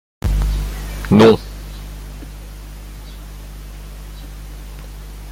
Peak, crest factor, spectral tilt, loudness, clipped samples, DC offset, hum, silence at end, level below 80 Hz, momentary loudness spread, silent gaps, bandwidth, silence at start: 0 dBFS; 20 dB; -6.5 dB/octave; -16 LUFS; under 0.1%; under 0.1%; 50 Hz at -30 dBFS; 0 s; -26 dBFS; 24 LU; none; 16.5 kHz; 0.25 s